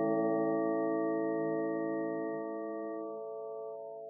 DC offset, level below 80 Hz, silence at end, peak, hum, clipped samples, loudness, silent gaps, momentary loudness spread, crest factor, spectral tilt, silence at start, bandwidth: under 0.1%; under -90 dBFS; 0 s; -20 dBFS; none; under 0.1%; -35 LUFS; none; 11 LU; 14 dB; -3.5 dB/octave; 0 s; 2 kHz